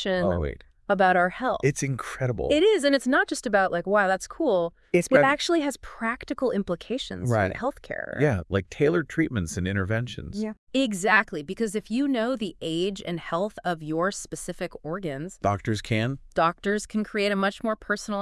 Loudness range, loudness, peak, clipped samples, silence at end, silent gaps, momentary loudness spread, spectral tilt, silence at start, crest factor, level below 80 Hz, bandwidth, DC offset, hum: 6 LU; -26 LUFS; -6 dBFS; under 0.1%; 0 s; 10.58-10.67 s; 11 LU; -5 dB/octave; 0 s; 20 dB; -50 dBFS; 12 kHz; under 0.1%; none